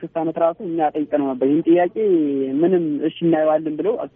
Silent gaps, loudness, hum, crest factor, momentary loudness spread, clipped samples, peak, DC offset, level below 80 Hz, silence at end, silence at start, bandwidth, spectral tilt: none; -19 LUFS; none; 12 dB; 5 LU; under 0.1%; -6 dBFS; under 0.1%; -66 dBFS; 0.1 s; 0 s; 3.7 kHz; -6.5 dB/octave